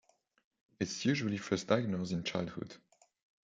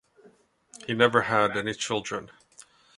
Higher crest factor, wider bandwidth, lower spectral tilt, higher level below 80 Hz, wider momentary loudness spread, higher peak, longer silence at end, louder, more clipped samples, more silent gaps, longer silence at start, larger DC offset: about the same, 24 dB vs 26 dB; second, 9.2 kHz vs 11.5 kHz; about the same, -5 dB/octave vs -4 dB/octave; second, -72 dBFS vs -64 dBFS; second, 10 LU vs 14 LU; second, -14 dBFS vs -2 dBFS; about the same, 0.7 s vs 0.7 s; second, -35 LUFS vs -25 LUFS; neither; neither; about the same, 0.8 s vs 0.85 s; neither